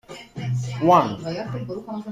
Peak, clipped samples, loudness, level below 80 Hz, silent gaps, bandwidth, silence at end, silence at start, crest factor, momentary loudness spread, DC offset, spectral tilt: -4 dBFS; under 0.1%; -23 LUFS; -56 dBFS; none; 14.5 kHz; 0 s; 0.1 s; 20 dB; 15 LU; under 0.1%; -7 dB/octave